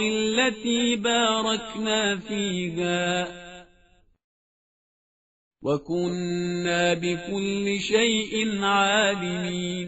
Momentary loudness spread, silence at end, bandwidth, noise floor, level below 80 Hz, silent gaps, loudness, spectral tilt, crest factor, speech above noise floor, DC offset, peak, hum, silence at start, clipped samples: 7 LU; 0 s; 8 kHz; -60 dBFS; -58 dBFS; 4.24-5.51 s; -24 LUFS; -3 dB/octave; 18 dB; 35 dB; under 0.1%; -8 dBFS; none; 0 s; under 0.1%